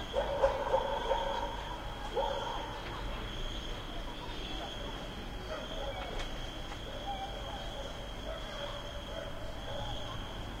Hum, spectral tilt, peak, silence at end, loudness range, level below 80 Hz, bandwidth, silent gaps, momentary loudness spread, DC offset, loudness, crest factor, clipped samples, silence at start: none; -4.5 dB/octave; -16 dBFS; 0 s; 6 LU; -44 dBFS; 16 kHz; none; 10 LU; under 0.1%; -38 LUFS; 22 dB; under 0.1%; 0 s